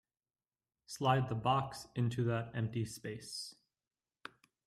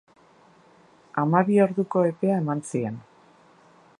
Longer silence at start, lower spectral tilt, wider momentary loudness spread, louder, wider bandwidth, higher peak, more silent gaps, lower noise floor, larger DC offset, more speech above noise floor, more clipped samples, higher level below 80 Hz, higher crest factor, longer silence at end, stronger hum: second, 0.9 s vs 1.15 s; second, -6 dB/octave vs -8.5 dB/octave; first, 20 LU vs 12 LU; second, -37 LUFS vs -24 LUFS; first, 14 kHz vs 11.5 kHz; second, -16 dBFS vs -4 dBFS; neither; first, under -90 dBFS vs -56 dBFS; neither; first, over 54 dB vs 33 dB; neither; about the same, -68 dBFS vs -72 dBFS; about the same, 22 dB vs 20 dB; first, 1.15 s vs 1 s; neither